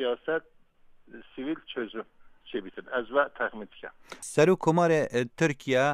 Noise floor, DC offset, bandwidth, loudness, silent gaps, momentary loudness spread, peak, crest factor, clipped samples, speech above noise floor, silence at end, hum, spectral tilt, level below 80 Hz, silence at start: -56 dBFS; under 0.1%; 14 kHz; -28 LUFS; none; 19 LU; -8 dBFS; 20 dB; under 0.1%; 28 dB; 0 s; none; -5.5 dB/octave; -64 dBFS; 0 s